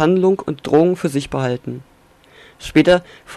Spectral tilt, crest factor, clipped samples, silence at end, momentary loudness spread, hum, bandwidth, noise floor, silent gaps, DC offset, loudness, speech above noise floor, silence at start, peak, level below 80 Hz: -6.5 dB/octave; 14 dB; under 0.1%; 0 s; 16 LU; none; 13 kHz; -49 dBFS; none; under 0.1%; -17 LUFS; 33 dB; 0 s; -2 dBFS; -46 dBFS